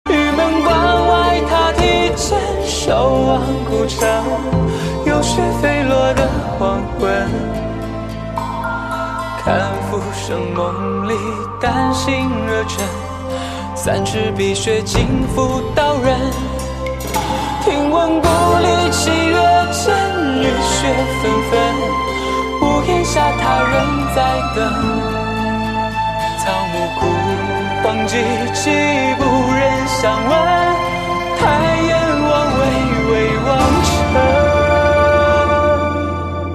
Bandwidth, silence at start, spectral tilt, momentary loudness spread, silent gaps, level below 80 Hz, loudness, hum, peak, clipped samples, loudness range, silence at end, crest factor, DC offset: 14 kHz; 0.05 s; -5 dB/octave; 8 LU; none; -28 dBFS; -16 LUFS; none; -2 dBFS; under 0.1%; 5 LU; 0 s; 14 dB; under 0.1%